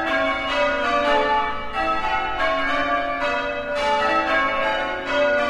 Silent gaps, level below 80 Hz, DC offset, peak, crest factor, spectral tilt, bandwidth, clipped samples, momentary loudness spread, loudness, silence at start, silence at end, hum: none; -42 dBFS; under 0.1%; -8 dBFS; 14 dB; -3.5 dB/octave; 11.5 kHz; under 0.1%; 4 LU; -21 LUFS; 0 s; 0 s; none